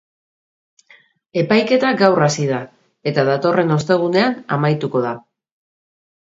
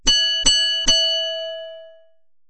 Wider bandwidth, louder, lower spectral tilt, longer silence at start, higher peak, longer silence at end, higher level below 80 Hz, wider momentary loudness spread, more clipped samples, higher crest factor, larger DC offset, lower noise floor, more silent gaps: second, 7.8 kHz vs 9.6 kHz; about the same, -17 LUFS vs -16 LUFS; first, -6 dB/octave vs 0.5 dB/octave; first, 1.35 s vs 0.05 s; about the same, 0 dBFS vs -2 dBFS; first, 1.1 s vs 0.6 s; second, -62 dBFS vs -36 dBFS; second, 11 LU vs 17 LU; neither; about the same, 18 dB vs 20 dB; neither; about the same, -52 dBFS vs -53 dBFS; neither